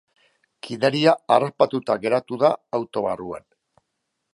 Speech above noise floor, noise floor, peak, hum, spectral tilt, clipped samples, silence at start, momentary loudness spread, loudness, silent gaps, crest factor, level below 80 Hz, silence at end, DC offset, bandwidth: 56 dB; -77 dBFS; -2 dBFS; none; -6 dB/octave; under 0.1%; 0.65 s; 17 LU; -21 LUFS; none; 20 dB; -66 dBFS; 0.95 s; under 0.1%; 11.5 kHz